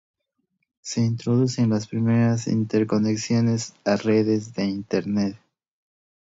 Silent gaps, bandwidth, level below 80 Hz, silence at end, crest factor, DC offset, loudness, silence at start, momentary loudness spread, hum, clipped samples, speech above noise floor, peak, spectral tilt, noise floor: none; 8 kHz; -60 dBFS; 0.95 s; 14 dB; under 0.1%; -23 LUFS; 0.85 s; 6 LU; none; under 0.1%; 53 dB; -8 dBFS; -6.5 dB/octave; -75 dBFS